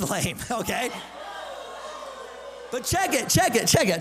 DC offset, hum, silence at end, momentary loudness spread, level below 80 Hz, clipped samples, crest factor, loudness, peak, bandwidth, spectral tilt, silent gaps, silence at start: under 0.1%; none; 0 s; 18 LU; -48 dBFS; under 0.1%; 18 dB; -24 LUFS; -8 dBFS; 16 kHz; -3 dB/octave; none; 0 s